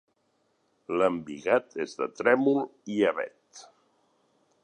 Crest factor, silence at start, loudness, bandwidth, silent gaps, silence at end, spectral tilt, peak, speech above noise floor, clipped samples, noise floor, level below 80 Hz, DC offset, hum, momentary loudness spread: 22 dB; 0.9 s; -27 LUFS; 9.6 kHz; none; 1 s; -5.5 dB/octave; -8 dBFS; 45 dB; under 0.1%; -72 dBFS; -72 dBFS; under 0.1%; none; 11 LU